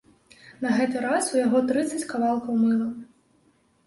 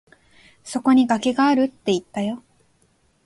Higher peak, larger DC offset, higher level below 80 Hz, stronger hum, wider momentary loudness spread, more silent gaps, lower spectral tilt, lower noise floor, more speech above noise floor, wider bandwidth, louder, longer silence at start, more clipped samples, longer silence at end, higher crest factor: second, -10 dBFS vs -4 dBFS; neither; about the same, -66 dBFS vs -62 dBFS; neither; second, 8 LU vs 12 LU; neither; about the same, -4.5 dB/octave vs -5 dB/octave; about the same, -64 dBFS vs -62 dBFS; about the same, 40 dB vs 43 dB; about the same, 11.5 kHz vs 11.5 kHz; second, -24 LUFS vs -20 LUFS; second, 0.45 s vs 0.65 s; neither; about the same, 0.85 s vs 0.85 s; about the same, 14 dB vs 18 dB